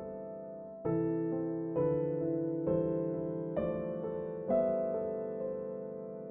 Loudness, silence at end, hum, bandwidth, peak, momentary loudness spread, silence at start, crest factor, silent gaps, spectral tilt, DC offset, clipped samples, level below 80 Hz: -35 LUFS; 0 s; none; 3.6 kHz; -20 dBFS; 11 LU; 0 s; 14 dB; none; -10.5 dB/octave; under 0.1%; under 0.1%; -62 dBFS